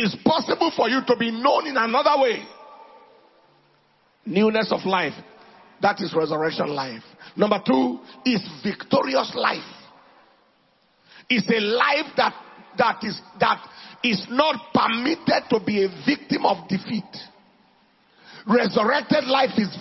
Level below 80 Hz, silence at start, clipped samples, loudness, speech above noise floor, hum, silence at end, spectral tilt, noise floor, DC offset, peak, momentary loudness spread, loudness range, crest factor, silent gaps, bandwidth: -66 dBFS; 0 s; under 0.1%; -22 LUFS; 40 dB; none; 0 s; -6 dB/octave; -62 dBFS; under 0.1%; -4 dBFS; 11 LU; 3 LU; 20 dB; none; 6 kHz